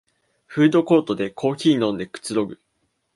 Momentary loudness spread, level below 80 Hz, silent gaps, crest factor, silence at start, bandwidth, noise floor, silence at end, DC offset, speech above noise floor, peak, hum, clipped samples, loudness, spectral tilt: 11 LU; -62 dBFS; none; 18 dB; 0.5 s; 11.5 kHz; -50 dBFS; 0.6 s; under 0.1%; 31 dB; -4 dBFS; none; under 0.1%; -21 LUFS; -6 dB/octave